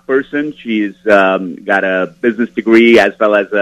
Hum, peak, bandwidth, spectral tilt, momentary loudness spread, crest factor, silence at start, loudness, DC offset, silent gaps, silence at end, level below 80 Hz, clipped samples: none; 0 dBFS; 10.5 kHz; -6 dB/octave; 10 LU; 12 dB; 0.1 s; -12 LUFS; under 0.1%; none; 0 s; -54 dBFS; 0.3%